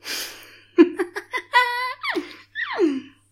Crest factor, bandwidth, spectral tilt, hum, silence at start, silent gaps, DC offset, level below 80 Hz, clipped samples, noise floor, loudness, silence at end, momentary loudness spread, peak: 20 dB; 16.5 kHz; -2.5 dB/octave; none; 0.05 s; none; under 0.1%; -70 dBFS; under 0.1%; -44 dBFS; -22 LUFS; 0.25 s; 14 LU; -2 dBFS